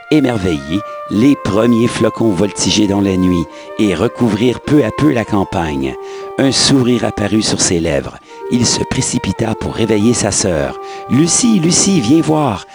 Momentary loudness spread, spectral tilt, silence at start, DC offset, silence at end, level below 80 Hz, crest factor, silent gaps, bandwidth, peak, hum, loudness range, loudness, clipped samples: 9 LU; -4.5 dB/octave; 0 s; under 0.1%; 0 s; -38 dBFS; 14 dB; none; over 20 kHz; 0 dBFS; none; 2 LU; -13 LUFS; under 0.1%